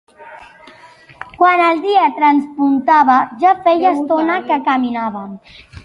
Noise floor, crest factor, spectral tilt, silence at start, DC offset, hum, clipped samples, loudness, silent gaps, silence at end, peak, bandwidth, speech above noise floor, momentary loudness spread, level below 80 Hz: -43 dBFS; 14 dB; -6 dB/octave; 0.2 s; under 0.1%; none; under 0.1%; -14 LUFS; none; 0.05 s; 0 dBFS; 10.5 kHz; 29 dB; 12 LU; -54 dBFS